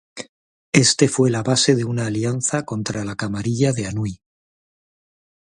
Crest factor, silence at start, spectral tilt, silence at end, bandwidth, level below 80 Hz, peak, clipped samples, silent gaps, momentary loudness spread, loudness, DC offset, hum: 22 dB; 0.15 s; -4.5 dB/octave; 1.3 s; 11.5 kHz; -52 dBFS; 0 dBFS; under 0.1%; 0.29-0.73 s; 12 LU; -20 LUFS; under 0.1%; none